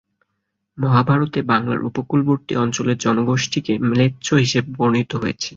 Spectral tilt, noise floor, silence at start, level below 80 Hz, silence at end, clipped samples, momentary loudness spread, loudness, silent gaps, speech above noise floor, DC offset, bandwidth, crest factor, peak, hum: -5.5 dB/octave; -75 dBFS; 0.75 s; -54 dBFS; 0 s; under 0.1%; 5 LU; -19 LUFS; none; 57 dB; under 0.1%; 7.8 kHz; 16 dB; -2 dBFS; none